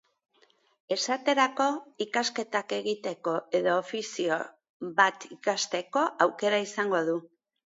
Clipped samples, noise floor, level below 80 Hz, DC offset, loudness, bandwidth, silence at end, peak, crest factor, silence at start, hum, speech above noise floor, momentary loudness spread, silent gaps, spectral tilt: under 0.1%; -66 dBFS; -82 dBFS; under 0.1%; -28 LUFS; 8 kHz; 0.5 s; -6 dBFS; 24 dB; 0.9 s; none; 38 dB; 8 LU; 4.69-4.80 s; -3 dB/octave